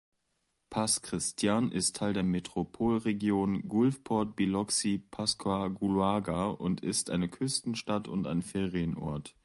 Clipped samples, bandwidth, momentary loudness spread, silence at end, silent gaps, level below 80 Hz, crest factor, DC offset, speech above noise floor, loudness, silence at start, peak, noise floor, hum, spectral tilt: under 0.1%; 11.5 kHz; 5 LU; 0.15 s; none; -56 dBFS; 18 dB; under 0.1%; 48 dB; -31 LUFS; 0.7 s; -14 dBFS; -79 dBFS; none; -4.5 dB/octave